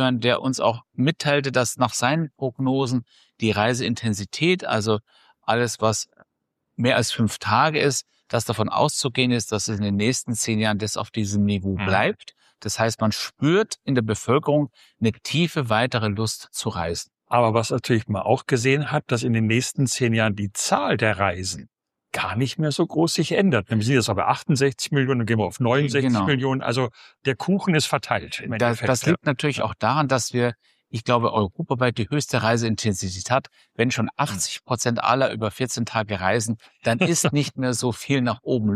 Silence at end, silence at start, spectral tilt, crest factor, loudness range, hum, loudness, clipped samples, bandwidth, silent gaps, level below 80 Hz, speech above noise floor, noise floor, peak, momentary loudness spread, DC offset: 0 s; 0 s; -4.5 dB/octave; 18 dB; 2 LU; none; -22 LUFS; under 0.1%; 14.5 kHz; none; -56 dBFS; 56 dB; -78 dBFS; -4 dBFS; 6 LU; under 0.1%